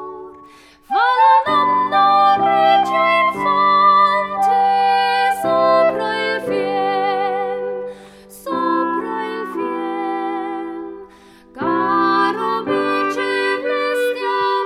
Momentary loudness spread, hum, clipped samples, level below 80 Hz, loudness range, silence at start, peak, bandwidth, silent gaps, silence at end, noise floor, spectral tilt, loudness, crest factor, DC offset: 12 LU; none; under 0.1%; -58 dBFS; 9 LU; 0 s; -2 dBFS; 14.5 kHz; none; 0 s; -45 dBFS; -4.5 dB/octave; -16 LUFS; 14 dB; under 0.1%